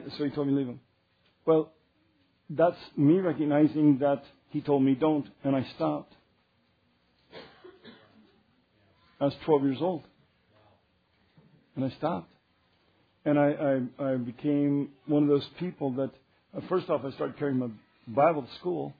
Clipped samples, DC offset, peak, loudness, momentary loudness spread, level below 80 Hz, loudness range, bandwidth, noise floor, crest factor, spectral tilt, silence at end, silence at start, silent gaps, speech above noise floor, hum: under 0.1%; under 0.1%; -10 dBFS; -28 LUFS; 13 LU; -72 dBFS; 10 LU; 5 kHz; -69 dBFS; 20 dB; -10.5 dB/octave; 0.1 s; 0 s; none; 42 dB; none